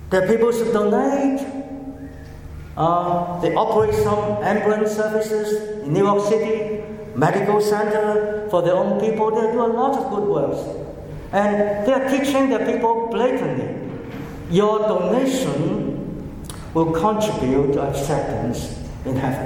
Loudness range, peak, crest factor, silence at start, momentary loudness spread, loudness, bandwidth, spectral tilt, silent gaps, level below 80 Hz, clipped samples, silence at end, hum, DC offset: 2 LU; -2 dBFS; 18 dB; 0 s; 13 LU; -20 LUFS; 17 kHz; -6.5 dB/octave; none; -42 dBFS; under 0.1%; 0 s; none; under 0.1%